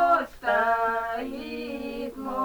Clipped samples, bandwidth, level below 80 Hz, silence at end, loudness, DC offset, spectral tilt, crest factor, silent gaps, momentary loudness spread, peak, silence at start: under 0.1%; over 20 kHz; -54 dBFS; 0 s; -27 LUFS; under 0.1%; -4.5 dB/octave; 16 dB; none; 11 LU; -10 dBFS; 0 s